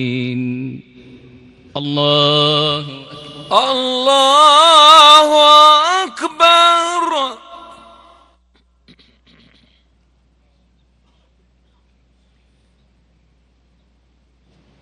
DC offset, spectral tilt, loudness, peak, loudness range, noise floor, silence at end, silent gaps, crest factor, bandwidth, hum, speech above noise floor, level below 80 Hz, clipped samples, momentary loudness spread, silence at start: under 0.1%; -3 dB/octave; -10 LUFS; 0 dBFS; 10 LU; -56 dBFS; 7.25 s; none; 14 dB; 16 kHz; none; 43 dB; -58 dBFS; 0.3%; 21 LU; 0 s